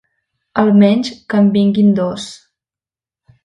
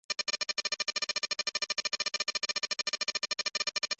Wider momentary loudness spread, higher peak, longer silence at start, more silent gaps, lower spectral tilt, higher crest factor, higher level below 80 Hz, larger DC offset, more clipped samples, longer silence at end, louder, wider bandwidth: first, 12 LU vs 1 LU; first, 0 dBFS vs -18 dBFS; first, 0.55 s vs 0.1 s; neither; first, -7 dB/octave vs 2 dB/octave; about the same, 14 dB vs 16 dB; first, -56 dBFS vs -78 dBFS; neither; neither; first, 1.1 s vs 0.05 s; first, -13 LUFS vs -31 LUFS; first, 9.8 kHz vs 8.6 kHz